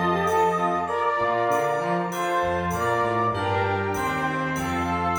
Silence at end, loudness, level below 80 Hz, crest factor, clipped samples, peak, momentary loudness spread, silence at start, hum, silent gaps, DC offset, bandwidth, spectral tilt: 0 s; -24 LUFS; -50 dBFS; 14 dB; under 0.1%; -10 dBFS; 4 LU; 0 s; none; none; under 0.1%; over 20 kHz; -5.5 dB/octave